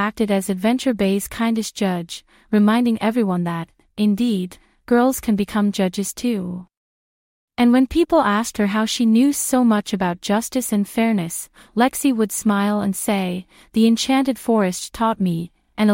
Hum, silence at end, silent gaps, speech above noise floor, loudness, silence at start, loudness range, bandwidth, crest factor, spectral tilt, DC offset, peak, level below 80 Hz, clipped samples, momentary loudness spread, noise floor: none; 0 s; 6.77-7.48 s; over 71 dB; -19 LUFS; 0 s; 3 LU; 16.5 kHz; 14 dB; -5 dB/octave; under 0.1%; -4 dBFS; -50 dBFS; under 0.1%; 10 LU; under -90 dBFS